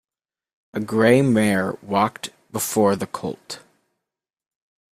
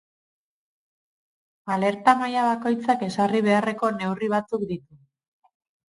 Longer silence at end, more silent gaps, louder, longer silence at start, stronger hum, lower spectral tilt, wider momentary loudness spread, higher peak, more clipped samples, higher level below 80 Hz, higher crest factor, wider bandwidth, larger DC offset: first, 1.35 s vs 1.15 s; neither; about the same, -21 LUFS vs -23 LUFS; second, 0.75 s vs 1.65 s; neither; about the same, -5.5 dB/octave vs -6 dB/octave; first, 18 LU vs 9 LU; about the same, -2 dBFS vs -2 dBFS; neither; first, -60 dBFS vs -68 dBFS; about the same, 20 dB vs 22 dB; first, 15.5 kHz vs 11.5 kHz; neither